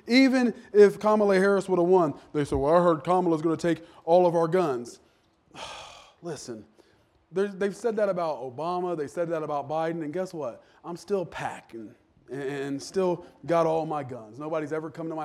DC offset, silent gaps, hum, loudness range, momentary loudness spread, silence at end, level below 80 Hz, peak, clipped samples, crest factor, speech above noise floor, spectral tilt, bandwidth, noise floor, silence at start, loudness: under 0.1%; none; none; 10 LU; 19 LU; 0 s; -58 dBFS; -6 dBFS; under 0.1%; 20 dB; 38 dB; -6.5 dB/octave; 12.5 kHz; -63 dBFS; 0.05 s; -26 LUFS